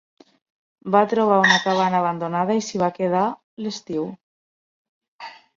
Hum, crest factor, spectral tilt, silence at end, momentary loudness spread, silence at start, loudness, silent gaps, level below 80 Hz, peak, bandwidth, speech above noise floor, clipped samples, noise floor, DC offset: none; 20 dB; -4.5 dB/octave; 0.25 s; 17 LU; 0.85 s; -20 LUFS; 3.44-3.57 s, 4.23-5.01 s, 5.08-5.19 s; -66 dBFS; -2 dBFS; 7.6 kHz; over 70 dB; under 0.1%; under -90 dBFS; under 0.1%